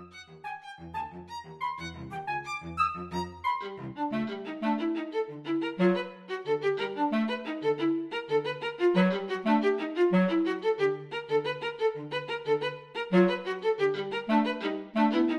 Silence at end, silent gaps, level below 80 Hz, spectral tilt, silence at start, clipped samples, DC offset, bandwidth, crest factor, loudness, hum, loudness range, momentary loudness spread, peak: 0 s; none; -64 dBFS; -7 dB/octave; 0 s; under 0.1%; under 0.1%; 10.5 kHz; 18 dB; -30 LUFS; none; 6 LU; 13 LU; -12 dBFS